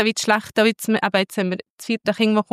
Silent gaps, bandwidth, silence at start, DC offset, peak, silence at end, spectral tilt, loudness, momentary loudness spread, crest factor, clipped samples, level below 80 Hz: 1.70-1.78 s; 15.5 kHz; 0 s; under 0.1%; -4 dBFS; 0.1 s; -4 dB/octave; -20 LUFS; 7 LU; 16 dB; under 0.1%; -68 dBFS